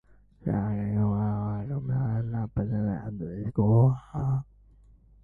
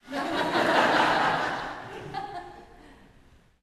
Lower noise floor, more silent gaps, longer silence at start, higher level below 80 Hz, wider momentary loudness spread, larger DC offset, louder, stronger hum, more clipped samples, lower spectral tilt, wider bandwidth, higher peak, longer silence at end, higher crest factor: about the same, -56 dBFS vs -57 dBFS; neither; first, 0.4 s vs 0.05 s; first, -48 dBFS vs -58 dBFS; second, 10 LU vs 17 LU; neither; second, -28 LUFS vs -25 LUFS; neither; neither; first, -12 dB/octave vs -4 dB/octave; second, 2.5 kHz vs 13.5 kHz; second, -12 dBFS vs -8 dBFS; about the same, 0.8 s vs 0.7 s; about the same, 16 dB vs 20 dB